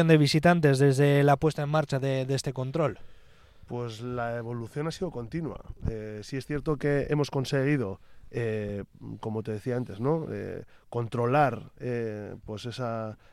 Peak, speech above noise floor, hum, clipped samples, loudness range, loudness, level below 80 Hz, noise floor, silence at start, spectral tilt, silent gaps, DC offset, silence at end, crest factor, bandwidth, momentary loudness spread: -6 dBFS; 25 dB; none; under 0.1%; 8 LU; -28 LUFS; -50 dBFS; -52 dBFS; 0 s; -6.5 dB/octave; none; under 0.1%; 0.2 s; 22 dB; 13.5 kHz; 16 LU